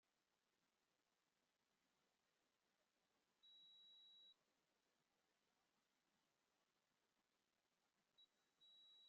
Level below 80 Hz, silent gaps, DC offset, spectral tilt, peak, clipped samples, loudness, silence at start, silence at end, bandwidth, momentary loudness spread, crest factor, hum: under -90 dBFS; none; under 0.1%; 1 dB/octave; -64 dBFS; under 0.1%; -68 LUFS; 0.05 s; 0 s; 6.4 kHz; 3 LU; 14 dB; none